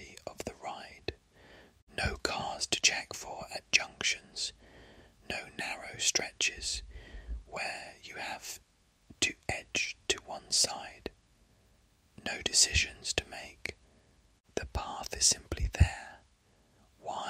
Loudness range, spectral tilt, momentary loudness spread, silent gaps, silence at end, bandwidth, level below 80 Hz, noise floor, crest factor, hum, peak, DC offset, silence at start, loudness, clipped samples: 5 LU; -1.5 dB/octave; 18 LU; 1.82-1.87 s, 14.40-14.44 s; 0 s; 16 kHz; -46 dBFS; -68 dBFS; 26 dB; none; -10 dBFS; under 0.1%; 0 s; -32 LUFS; under 0.1%